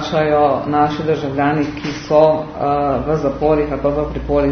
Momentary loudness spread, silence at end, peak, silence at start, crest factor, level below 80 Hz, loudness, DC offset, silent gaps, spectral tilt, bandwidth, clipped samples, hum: 6 LU; 0 s; 0 dBFS; 0 s; 16 dB; -34 dBFS; -17 LUFS; under 0.1%; none; -7 dB/octave; 6.6 kHz; under 0.1%; none